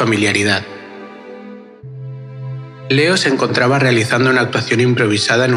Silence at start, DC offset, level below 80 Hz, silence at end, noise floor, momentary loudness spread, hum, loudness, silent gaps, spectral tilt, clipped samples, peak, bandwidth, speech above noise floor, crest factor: 0 s; under 0.1%; -64 dBFS; 0 s; -35 dBFS; 21 LU; none; -14 LUFS; none; -5 dB/octave; under 0.1%; 0 dBFS; 12.5 kHz; 21 dB; 16 dB